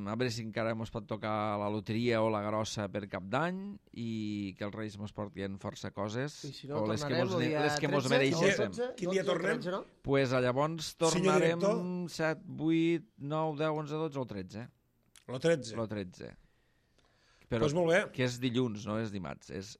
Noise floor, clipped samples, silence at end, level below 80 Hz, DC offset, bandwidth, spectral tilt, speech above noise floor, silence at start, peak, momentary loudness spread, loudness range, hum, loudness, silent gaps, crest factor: -71 dBFS; under 0.1%; 0.05 s; -64 dBFS; under 0.1%; 14 kHz; -5.5 dB/octave; 38 dB; 0 s; -14 dBFS; 13 LU; 7 LU; none; -33 LUFS; none; 20 dB